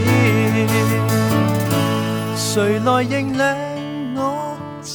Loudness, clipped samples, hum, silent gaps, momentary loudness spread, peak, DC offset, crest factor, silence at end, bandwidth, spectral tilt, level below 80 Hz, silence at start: -18 LUFS; under 0.1%; none; none; 10 LU; -4 dBFS; under 0.1%; 14 dB; 0 s; over 20 kHz; -5.5 dB/octave; -50 dBFS; 0 s